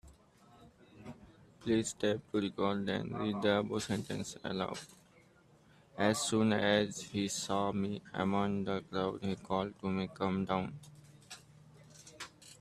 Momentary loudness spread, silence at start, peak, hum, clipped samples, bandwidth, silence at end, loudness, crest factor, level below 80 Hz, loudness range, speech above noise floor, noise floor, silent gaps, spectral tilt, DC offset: 22 LU; 0.05 s; -14 dBFS; none; under 0.1%; 14 kHz; 0.05 s; -35 LUFS; 22 dB; -68 dBFS; 5 LU; 30 dB; -64 dBFS; none; -5 dB/octave; under 0.1%